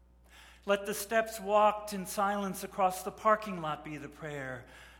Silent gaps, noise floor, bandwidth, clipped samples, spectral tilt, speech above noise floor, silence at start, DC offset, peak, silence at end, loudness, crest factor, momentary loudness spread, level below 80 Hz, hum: none; -58 dBFS; 17.5 kHz; under 0.1%; -4 dB/octave; 25 dB; 0.35 s; under 0.1%; -12 dBFS; 0 s; -32 LUFS; 20 dB; 15 LU; -62 dBFS; none